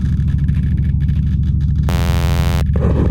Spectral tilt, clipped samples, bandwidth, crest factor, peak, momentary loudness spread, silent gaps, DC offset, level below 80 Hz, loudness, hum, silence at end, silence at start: -7.5 dB/octave; under 0.1%; 17 kHz; 12 dB; -2 dBFS; 1 LU; none; under 0.1%; -18 dBFS; -16 LUFS; 60 Hz at -25 dBFS; 0 s; 0 s